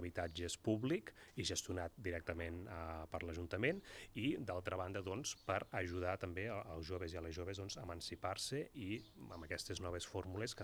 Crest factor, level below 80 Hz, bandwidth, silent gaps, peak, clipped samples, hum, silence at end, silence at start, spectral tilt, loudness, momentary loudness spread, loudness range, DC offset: 24 dB; -66 dBFS; over 20 kHz; none; -22 dBFS; under 0.1%; none; 0 s; 0 s; -4.5 dB/octave; -44 LUFS; 7 LU; 3 LU; under 0.1%